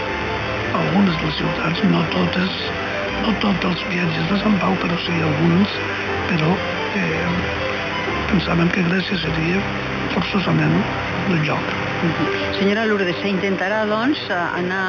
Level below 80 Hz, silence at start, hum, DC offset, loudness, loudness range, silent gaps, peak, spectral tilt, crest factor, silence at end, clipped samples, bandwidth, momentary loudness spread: -40 dBFS; 0 s; 50 Hz at -35 dBFS; under 0.1%; -19 LUFS; 1 LU; none; -6 dBFS; -6.5 dB/octave; 14 dB; 0 s; under 0.1%; 7 kHz; 5 LU